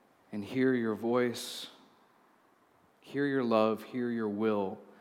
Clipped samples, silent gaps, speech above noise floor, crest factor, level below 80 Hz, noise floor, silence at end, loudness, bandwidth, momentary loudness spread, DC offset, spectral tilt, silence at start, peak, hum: under 0.1%; none; 35 dB; 20 dB; -88 dBFS; -66 dBFS; 0.1 s; -32 LUFS; 16.5 kHz; 13 LU; under 0.1%; -5.5 dB/octave; 0.3 s; -14 dBFS; none